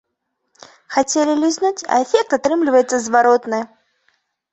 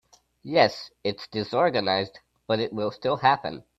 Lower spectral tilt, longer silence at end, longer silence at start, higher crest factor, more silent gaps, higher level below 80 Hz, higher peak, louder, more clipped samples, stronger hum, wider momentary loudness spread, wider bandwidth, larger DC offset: second, -2.5 dB/octave vs -5.5 dB/octave; first, 0.85 s vs 0.2 s; first, 0.9 s vs 0.45 s; second, 16 dB vs 22 dB; neither; about the same, -64 dBFS vs -64 dBFS; about the same, -2 dBFS vs -4 dBFS; first, -17 LUFS vs -25 LUFS; neither; neither; about the same, 8 LU vs 10 LU; about the same, 8.4 kHz vs 7.8 kHz; neither